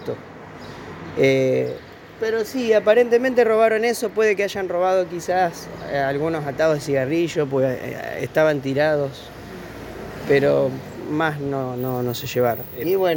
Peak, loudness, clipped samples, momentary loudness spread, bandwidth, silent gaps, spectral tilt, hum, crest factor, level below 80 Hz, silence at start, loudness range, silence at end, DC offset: -4 dBFS; -21 LUFS; under 0.1%; 18 LU; 17 kHz; none; -5.5 dB/octave; none; 16 dB; -54 dBFS; 0 s; 4 LU; 0 s; under 0.1%